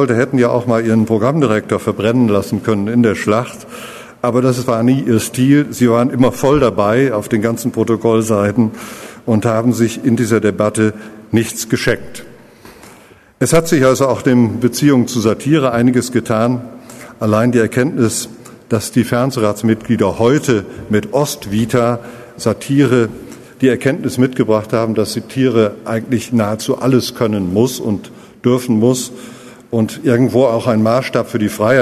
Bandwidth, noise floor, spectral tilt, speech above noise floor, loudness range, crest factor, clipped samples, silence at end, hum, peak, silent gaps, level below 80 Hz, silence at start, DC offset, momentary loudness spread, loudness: 13.5 kHz; -43 dBFS; -6 dB/octave; 29 dB; 3 LU; 14 dB; under 0.1%; 0 s; none; 0 dBFS; none; -46 dBFS; 0 s; under 0.1%; 9 LU; -14 LUFS